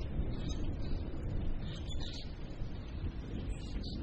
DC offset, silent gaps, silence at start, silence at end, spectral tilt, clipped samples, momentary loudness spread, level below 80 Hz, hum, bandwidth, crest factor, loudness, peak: under 0.1%; none; 0 s; 0 s; -6.5 dB/octave; under 0.1%; 5 LU; -40 dBFS; none; 8.4 kHz; 12 dB; -42 LUFS; -24 dBFS